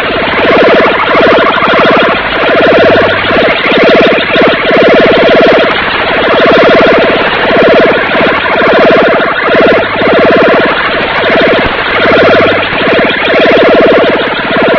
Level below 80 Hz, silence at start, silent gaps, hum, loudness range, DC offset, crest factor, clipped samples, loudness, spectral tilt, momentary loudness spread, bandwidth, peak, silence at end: -34 dBFS; 0 s; none; none; 1 LU; 0.2%; 6 dB; 6%; -5 LUFS; -6 dB/octave; 4 LU; 5.4 kHz; 0 dBFS; 0 s